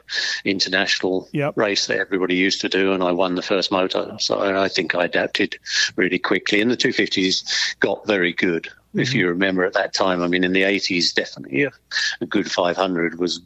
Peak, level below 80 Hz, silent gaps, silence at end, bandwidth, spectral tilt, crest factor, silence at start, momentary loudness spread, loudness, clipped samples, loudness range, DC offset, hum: -2 dBFS; -58 dBFS; none; 0.05 s; 9 kHz; -3.5 dB/octave; 18 dB; 0.1 s; 4 LU; -20 LUFS; under 0.1%; 1 LU; under 0.1%; none